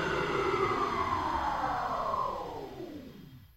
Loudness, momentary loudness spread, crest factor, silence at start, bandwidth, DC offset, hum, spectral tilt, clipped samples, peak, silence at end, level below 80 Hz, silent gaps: -32 LUFS; 15 LU; 16 dB; 0 s; 16 kHz; under 0.1%; none; -5.5 dB/octave; under 0.1%; -18 dBFS; 0.1 s; -52 dBFS; none